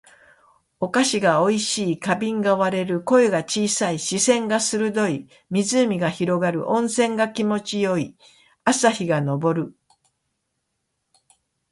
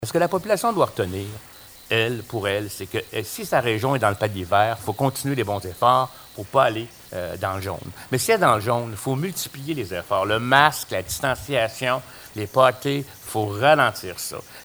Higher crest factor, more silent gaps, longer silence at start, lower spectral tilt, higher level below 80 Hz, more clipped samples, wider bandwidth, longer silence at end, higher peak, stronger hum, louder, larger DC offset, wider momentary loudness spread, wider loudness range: about the same, 20 dB vs 22 dB; neither; first, 0.8 s vs 0 s; about the same, -4 dB/octave vs -4.5 dB/octave; second, -64 dBFS vs -54 dBFS; neither; second, 11.5 kHz vs over 20 kHz; first, 2 s vs 0 s; about the same, -2 dBFS vs 0 dBFS; neither; about the same, -21 LUFS vs -22 LUFS; neither; second, 6 LU vs 13 LU; about the same, 4 LU vs 3 LU